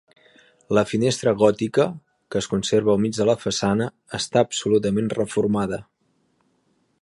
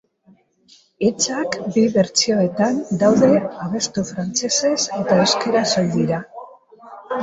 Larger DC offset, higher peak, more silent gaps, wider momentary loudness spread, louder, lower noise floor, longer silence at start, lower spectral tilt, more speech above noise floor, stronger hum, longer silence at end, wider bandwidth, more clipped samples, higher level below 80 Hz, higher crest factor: neither; about the same, -2 dBFS vs -2 dBFS; neither; about the same, 9 LU vs 8 LU; second, -22 LUFS vs -18 LUFS; first, -67 dBFS vs -55 dBFS; second, 0.7 s vs 1 s; about the same, -5 dB/octave vs -4 dB/octave; first, 46 dB vs 37 dB; neither; first, 1.2 s vs 0 s; first, 11.5 kHz vs 8 kHz; neither; about the same, -54 dBFS vs -58 dBFS; about the same, 20 dB vs 16 dB